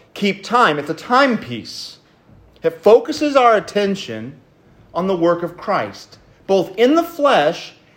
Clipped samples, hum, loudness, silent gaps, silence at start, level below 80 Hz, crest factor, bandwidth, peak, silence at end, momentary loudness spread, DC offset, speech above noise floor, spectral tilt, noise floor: under 0.1%; none; -16 LUFS; none; 0.15 s; -58 dBFS; 18 dB; 16.5 kHz; 0 dBFS; 0.25 s; 16 LU; under 0.1%; 33 dB; -5 dB/octave; -49 dBFS